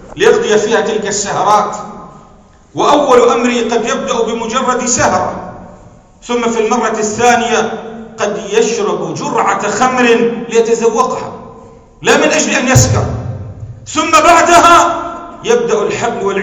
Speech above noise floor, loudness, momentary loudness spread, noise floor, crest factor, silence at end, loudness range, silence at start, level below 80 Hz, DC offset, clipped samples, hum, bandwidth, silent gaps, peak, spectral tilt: 31 dB; -11 LUFS; 14 LU; -41 dBFS; 12 dB; 0 s; 5 LU; 0 s; -38 dBFS; under 0.1%; 0.9%; none; over 20 kHz; none; 0 dBFS; -4 dB/octave